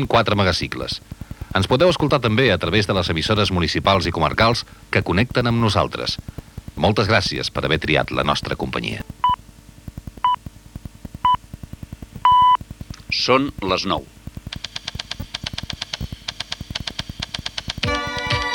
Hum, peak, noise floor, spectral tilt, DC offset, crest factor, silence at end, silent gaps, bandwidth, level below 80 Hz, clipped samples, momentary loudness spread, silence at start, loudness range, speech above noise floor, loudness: none; -2 dBFS; -44 dBFS; -5 dB/octave; under 0.1%; 20 dB; 0 s; none; 18 kHz; -40 dBFS; under 0.1%; 20 LU; 0 s; 8 LU; 25 dB; -20 LUFS